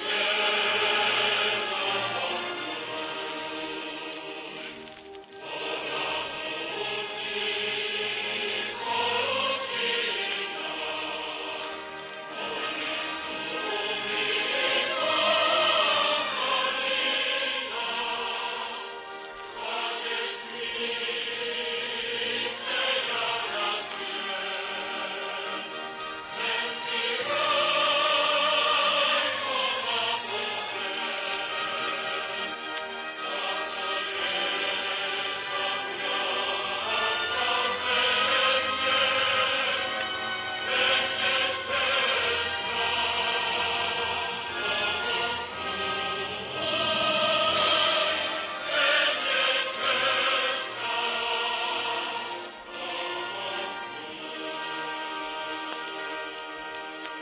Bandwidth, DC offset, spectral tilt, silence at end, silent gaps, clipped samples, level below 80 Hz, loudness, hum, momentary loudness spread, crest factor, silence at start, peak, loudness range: 4 kHz; under 0.1%; 1.5 dB/octave; 0 s; none; under 0.1%; -64 dBFS; -27 LUFS; none; 12 LU; 16 dB; 0 s; -12 dBFS; 8 LU